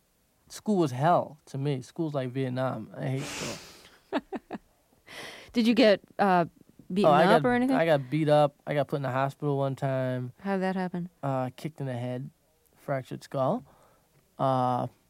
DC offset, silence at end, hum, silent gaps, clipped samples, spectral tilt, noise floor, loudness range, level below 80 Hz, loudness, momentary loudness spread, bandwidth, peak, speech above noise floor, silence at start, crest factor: under 0.1%; 0.2 s; none; none; under 0.1%; -6.5 dB/octave; -67 dBFS; 10 LU; -66 dBFS; -28 LUFS; 16 LU; 16 kHz; -8 dBFS; 40 dB; 0.5 s; 20 dB